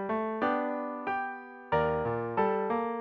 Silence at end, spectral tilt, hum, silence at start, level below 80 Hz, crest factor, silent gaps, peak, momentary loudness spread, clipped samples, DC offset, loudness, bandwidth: 0 s; -9 dB/octave; none; 0 s; -56 dBFS; 16 dB; none; -16 dBFS; 6 LU; under 0.1%; under 0.1%; -31 LUFS; 5.6 kHz